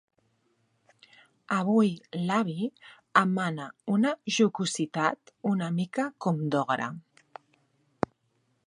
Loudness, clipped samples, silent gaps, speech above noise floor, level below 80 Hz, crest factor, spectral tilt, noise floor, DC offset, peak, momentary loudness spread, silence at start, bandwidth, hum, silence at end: -28 LUFS; under 0.1%; none; 45 dB; -72 dBFS; 24 dB; -5.5 dB/octave; -73 dBFS; under 0.1%; -6 dBFS; 11 LU; 1.5 s; 11 kHz; none; 1.65 s